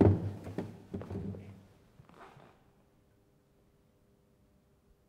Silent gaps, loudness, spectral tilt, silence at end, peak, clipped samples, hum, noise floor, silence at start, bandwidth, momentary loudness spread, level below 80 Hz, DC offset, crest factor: none; -37 LUFS; -10 dB/octave; 2.8 s; -12 dBFS; under 0.1%; none; -68 dBFS; 0 s; 5.6 kHz; 24 LU; -60 dBFS; under 0.1%; 26 dB